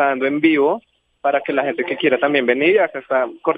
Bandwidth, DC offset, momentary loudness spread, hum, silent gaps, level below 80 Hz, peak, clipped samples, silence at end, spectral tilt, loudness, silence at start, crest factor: 4.9 kHz; under 0.1%; 6 LU; none; none; -70 dBFS; -2 dBFS; under 0.1%; 0 s; -7.5 dB/octave; -18 LUFS; 0 s; 16 dB